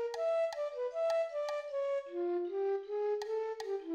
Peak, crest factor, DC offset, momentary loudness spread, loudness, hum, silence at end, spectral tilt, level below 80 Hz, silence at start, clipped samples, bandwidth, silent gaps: -24 dBFS; 12 dB; under 0.1%; 4 LU; -36 LUFS; none; 0 s; -2.5 dB/octave; -82 dBFS; 0 s; under 0.1%; 12 kHz; none